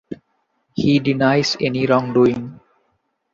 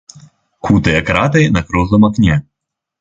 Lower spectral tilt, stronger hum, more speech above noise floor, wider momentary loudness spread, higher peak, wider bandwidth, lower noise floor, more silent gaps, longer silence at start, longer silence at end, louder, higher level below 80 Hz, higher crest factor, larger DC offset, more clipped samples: about the same, -6 dB/octave vs -7 dB/octave; neither; second, 51 dB vs 67 dB; first, 19 LU vs 4 LU; about the same, -2 dBFS vs 0 dBFS; about the same, 7.6 kHz vs 7.8 kHz; second, -68 dBFS vs -79 dBFS; neither; about the same, 0.1 s vs 0.15 s; first, 0.8 s vs 0.6 s; second, -17 LUFS vs -13 LUFS; second, -54 dBFS vs -30 dBFS; about the same, 16 dB vs 14 dB; neither; neither